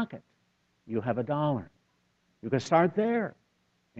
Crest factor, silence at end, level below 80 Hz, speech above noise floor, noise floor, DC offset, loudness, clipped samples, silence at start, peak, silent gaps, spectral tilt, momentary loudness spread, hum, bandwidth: 22 dB; 0 s; -68 dBFS; 44 dB; -73 dBFS; under 0.1%; -29 LUFS; under 0.1%; 0 s; -10 dBFS; none; -7 dB/octave; 13 LU; none; 8.2 kHz